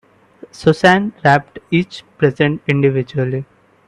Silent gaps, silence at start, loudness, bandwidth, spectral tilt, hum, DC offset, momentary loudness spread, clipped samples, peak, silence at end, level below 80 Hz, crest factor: none; 0.6 s; -16 LUFS; 11 kHz; -7 dB/octave; none; under 0.1%; 8 LU; under 0.1%; 0 dBFS; 0.45 s; -52 dBFS; 16 dB